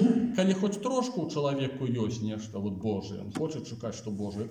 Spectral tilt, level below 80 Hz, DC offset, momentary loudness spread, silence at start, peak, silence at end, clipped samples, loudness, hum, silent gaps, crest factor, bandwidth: -6.5 dB/octave; -66 dBFS; under 0.1%; 10 LU; 0 s; -12 dBFS; 0 s; under 0.1%; -31 LUFS; none; none; 18 dB; 10.5 kHz